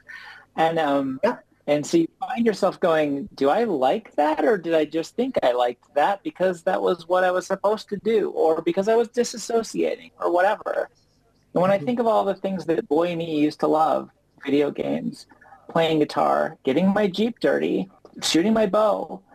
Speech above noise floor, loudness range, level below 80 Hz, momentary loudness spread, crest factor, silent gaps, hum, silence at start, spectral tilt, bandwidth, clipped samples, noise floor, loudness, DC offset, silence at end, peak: 40 dB; 2 LU; -64 dBFS; 7 LU; 14 dB; none; none; 0.1 s; -5 dB/octave; 15.5 kHz; under 0.1%; -62 dBFS; -23 LUFS; under 0.1%; 0.15 s; -8 dBFS